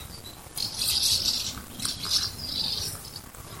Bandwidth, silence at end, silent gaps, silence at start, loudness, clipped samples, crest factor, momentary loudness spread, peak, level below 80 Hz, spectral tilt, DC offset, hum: 17 kHz; 0 s; none; 0 s; -26 LUFS; under 0.1%; 22 dB; 19 LU; -8 dBFS; -50 dBFS; -0.5 dB/octave; under 0.1%; none